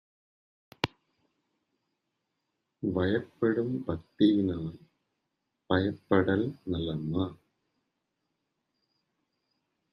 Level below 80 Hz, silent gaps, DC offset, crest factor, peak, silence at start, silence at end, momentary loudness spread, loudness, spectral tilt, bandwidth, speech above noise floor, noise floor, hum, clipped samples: -62 dBFS; none; under 0.1%; 28 dB; -4 dBFS; 0.85 s; 2.6 s; 10 LU; -30 LUFS; -8 dB/octave; 7 kHz; 54 dB; -83 dBFS; none; under 0.1%